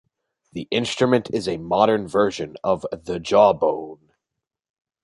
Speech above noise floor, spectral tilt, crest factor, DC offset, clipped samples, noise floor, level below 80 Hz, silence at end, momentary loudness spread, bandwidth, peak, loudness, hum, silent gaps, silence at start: 63 dB; -5.5 dB/octave; 20 dB; under 0.1%; under 0.1%; -84 dBFS; -56 dBFS; 1.1 s; 13 LU; 11.5 kHz; -2 dBFS; -21 LUFS; none; none; 0.55 s